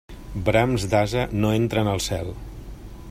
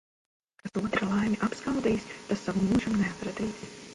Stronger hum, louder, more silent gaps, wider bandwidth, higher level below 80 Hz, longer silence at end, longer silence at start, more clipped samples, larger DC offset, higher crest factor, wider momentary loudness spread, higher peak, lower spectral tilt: neither; first, -23 LUFS vs -30 LUFS; neither; first, 16 kHz vs 11.5 kHz; first, -38 dBFS vs -54 dBFS; about the same, 0 s vs 0 s; second, 0.1 s vs 0.65 s; neither; neither; about the same, 20 dB vs 18 dB; first, 19 LU vs 9 LU; first, -4 dBFS vs -12 dBFS; about the same, -5.5 dB/octave vs -6 dB/octave